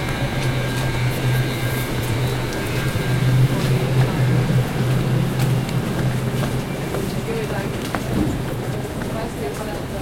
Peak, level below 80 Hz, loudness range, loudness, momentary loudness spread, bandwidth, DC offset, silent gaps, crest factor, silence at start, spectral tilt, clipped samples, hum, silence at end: -4 dBFS; -34 dBFS; 5 LU; -21 LUFS; 7 LU; 16.5 kHz; under 0.1%; none; 16 dB; 0 s; -6 dB/octave; under 0.1%; none; 0 s